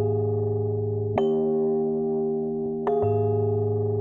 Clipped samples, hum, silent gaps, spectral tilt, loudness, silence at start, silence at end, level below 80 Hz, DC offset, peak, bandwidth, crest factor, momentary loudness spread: under 0.1%; none; none; -11.5 dB/octave; -25 LUFS; 0 s; 0 s; -56 dBFS; under 0.1%; -10 dBFS; 3.3 kHz; 14 dB; 4 LU